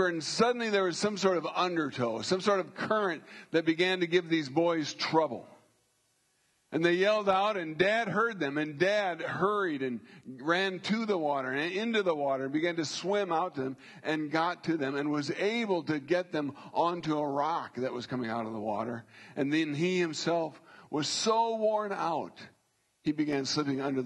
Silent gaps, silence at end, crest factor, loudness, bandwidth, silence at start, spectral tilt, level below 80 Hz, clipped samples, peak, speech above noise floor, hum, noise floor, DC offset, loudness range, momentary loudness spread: none; 0 s; 20 dB; -30 LUFS; 11.5 kHz; 0 s; -4.5 dB/octave; -76 dBFS; under 0.1%; -12 dBFS; 43 dB; none; -73 dBFS; under 0.1%; 3 LU; 8 LU